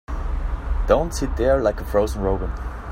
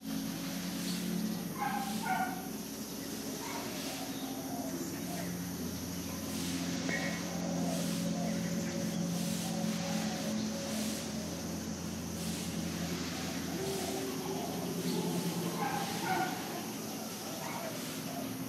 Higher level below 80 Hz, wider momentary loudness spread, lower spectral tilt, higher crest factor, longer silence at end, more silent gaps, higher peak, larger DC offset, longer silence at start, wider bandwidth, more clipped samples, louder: first, -26 dBFS vs -62 dBFS; first, 10 LU vs 5 LU; first, -6.5 dB/octave vs -4 dB/octave; about the same, 18 dB vs 18 dB; about the same, 0 s vs 0 s; neither; first, -4 dBFS vs -20 dBFS; neither; about the same, 0.1 s vs 0 s; about the same, 16 kHz vs 16 kHz; neither; first, -23 LUFS vs -37 LUFS